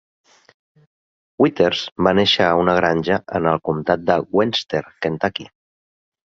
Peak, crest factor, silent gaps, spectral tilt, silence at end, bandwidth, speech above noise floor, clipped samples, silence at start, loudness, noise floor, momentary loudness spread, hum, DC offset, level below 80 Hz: -2 dBFS; 18 dB; 1.92-1.96 s; -5.5 dB/octave; 0.9 s; 7.8 kHz; over 72 dB; under 0.1%; 1.4 s; -18 LUFS; under -90 dBFS; 8 LU; none; under 0.1%; -50 dBFS